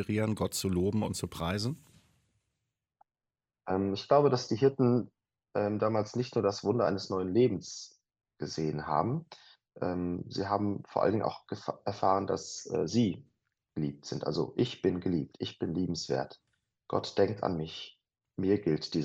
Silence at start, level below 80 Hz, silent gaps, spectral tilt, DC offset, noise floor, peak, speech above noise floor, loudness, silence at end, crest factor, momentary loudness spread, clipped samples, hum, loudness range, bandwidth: 0 s; -62 dBFS; none; -6 dB/octave; under 0.1%; under -90 dBFS; -12 dBFS; over 59 dB; -32 LUFS; 0 s; 20 dB; 11 LU; under 0.1%; none; 5 LU; 15.5 kHz